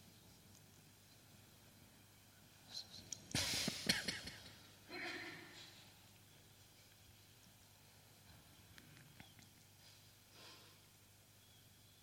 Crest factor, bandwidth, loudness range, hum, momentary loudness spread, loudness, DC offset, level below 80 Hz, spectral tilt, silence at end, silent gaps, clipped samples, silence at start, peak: 32 dB; 16.5 kHz; 19 LU; 50 Hz at -70 dBFS; 25 LU; -44 LUFS; under 0.1%; -74 dBFS; -2 dB/octave; 0 s; none; under 0.1%; 0 s; -20 dBFS